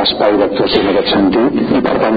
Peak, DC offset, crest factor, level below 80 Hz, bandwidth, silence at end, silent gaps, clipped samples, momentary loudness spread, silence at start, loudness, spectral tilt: 0 dBFS; under 0.1%; 12 dB; -38 dBFS; 5 kHz; 0 s; none; under 0.1%; 2 LU; 0 s; -12 LUFS; -8 dB/octave